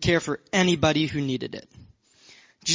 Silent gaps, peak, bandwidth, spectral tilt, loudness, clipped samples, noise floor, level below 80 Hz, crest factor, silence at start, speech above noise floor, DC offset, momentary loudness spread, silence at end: none; -6 dBFS; 7.8 kHz; -4 dB/octave; -24 LUFS; under 0.1%; -55 dBFS; -48 dBFS; 20 dB; 0 s; 30 dB; under 0.1%; 13 LU; 0 s